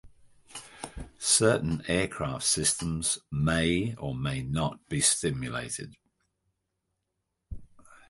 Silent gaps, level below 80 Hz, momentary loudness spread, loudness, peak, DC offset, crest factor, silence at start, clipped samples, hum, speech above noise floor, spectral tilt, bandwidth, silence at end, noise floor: none; -48 dBFS; 21 LU; -27 LUFS; -10 dBFS; under 0.1%; 22 dB; 0.05 s; under 0.1%; none; 53 dB; -3.5 dB/octave; 12 kHz; 0.15 s; -82 dBFS